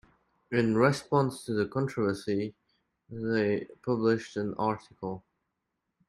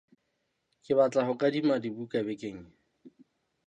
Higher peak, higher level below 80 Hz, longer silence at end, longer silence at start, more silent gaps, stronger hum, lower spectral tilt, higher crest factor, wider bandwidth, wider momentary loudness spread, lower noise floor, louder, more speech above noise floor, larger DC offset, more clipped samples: about the same, -12 dBFS vs -12 dBFS; first, -66 dBFS vs -72 dBFS; first, 0.9 s vs 0.55 s; second, 0.5 s vs 0.9 s; neither; neither; about the same, -7 dB/octave vs -6.5 dB/octave; about the same, 18 dB vs 18 dB; first, 13 kHz vs 8.8 kHz; about the same, 14 LU vs 14 LU; first, -83 dBFS vs -79 dBFS; about the same, -30 LUFS vs -29 LUFS; first, 54 dB vs 50 dB; neither; neither